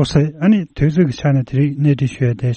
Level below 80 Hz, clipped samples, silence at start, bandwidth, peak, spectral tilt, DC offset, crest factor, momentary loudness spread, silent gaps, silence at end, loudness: -40 dBFS; under 0.1%; 0 s; 8.6 kHz; -2 dBFS; -8 dB/octave; under 0.1%; 14 dB; 3 LU; none; 0 s; -16 LUFS